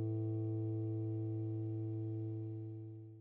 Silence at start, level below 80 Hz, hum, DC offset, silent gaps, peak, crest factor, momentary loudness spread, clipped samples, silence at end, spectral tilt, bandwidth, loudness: 0 s; -78 dBFS; none; under 0.1%; none; -32 dBFS; 10 dB; 8 LU; under 0.1%; 0 s; -14 dB/octave; 1.3 kHz; -41 LUFS